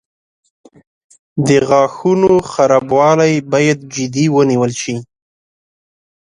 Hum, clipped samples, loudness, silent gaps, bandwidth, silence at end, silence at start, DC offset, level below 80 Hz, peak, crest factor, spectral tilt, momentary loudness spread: none; under 0.1%; -13 LUFS; none; 11 kHz; 1.2 s; 1.35 s; under 0.1%; -52 dBFS; 0 dBFS; 14 dB; -5.5 dB/octave; 9 LU